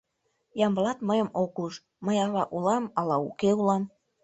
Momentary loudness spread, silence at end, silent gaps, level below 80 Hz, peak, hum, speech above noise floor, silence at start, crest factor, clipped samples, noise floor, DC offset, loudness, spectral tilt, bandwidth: 10 LU; 0.35 s; none; -68 dBFS; -10 dBFS; none; 48 dB; 0.55 s; 18 dB; under 0.1%; -75 dBFS; under 0.1%; -27 LUFS; -6.5 dB/octave; 8.2 kHz